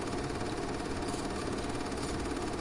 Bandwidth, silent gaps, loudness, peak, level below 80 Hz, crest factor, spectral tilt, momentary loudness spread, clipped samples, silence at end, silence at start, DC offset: 11.5 kHz; none; -36 LUFS; -22 dBFS; -46 dBFS; 14 dB; -5 dB/octave; 1 LU; under 0.1%; 0 s; 0 s; under 0.1%